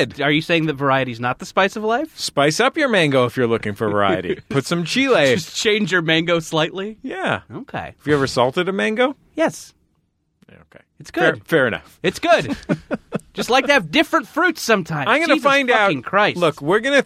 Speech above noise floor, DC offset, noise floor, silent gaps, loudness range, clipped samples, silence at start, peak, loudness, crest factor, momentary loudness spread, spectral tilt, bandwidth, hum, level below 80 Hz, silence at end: 48 dB; under 0.1%; -67 dBFS; none; 5 LU; under 0.1%; 0 s; -2 dBFS; -18 LUFS; 18 dB; 9 LU; -4.5 dB/octave; 16 kHz; none; -54 dBFS; 0 s